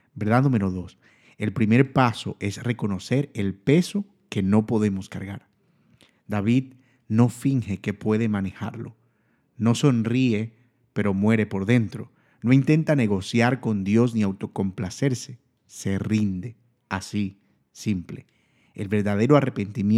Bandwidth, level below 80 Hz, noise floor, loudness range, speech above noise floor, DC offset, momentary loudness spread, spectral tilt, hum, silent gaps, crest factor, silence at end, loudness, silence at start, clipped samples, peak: 13 kHz; -62 dBFS; -66 dBFS; 6 LU; 44 dB; under 0.1%; 14 LU; -7 dB/octave; none; none; 20 dB; 0 s; -24 LUFS; 0.15 s; under 0.1%; -2 dBFS